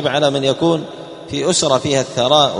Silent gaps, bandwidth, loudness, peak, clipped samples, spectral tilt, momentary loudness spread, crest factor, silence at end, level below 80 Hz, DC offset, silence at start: none; 11 kHz; -16 LUFS; 0 dBFS; under 0.1%; -4 dB/octave; 11 LU; 16 dB; 0 s; -52 dBFS; under 0.1%; 0 s